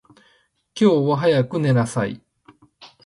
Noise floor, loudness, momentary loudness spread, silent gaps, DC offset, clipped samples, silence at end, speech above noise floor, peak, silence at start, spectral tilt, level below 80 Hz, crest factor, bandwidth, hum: -61 dBFS; -19 LUFS; 14 LU; none; under 0.1%; under 0.1%; 0.2 s; 43 dB; -4 dBFS; 0.75 s; -7 dB/octave; -58 dBFS; 16 dB; 11.5 kHz; none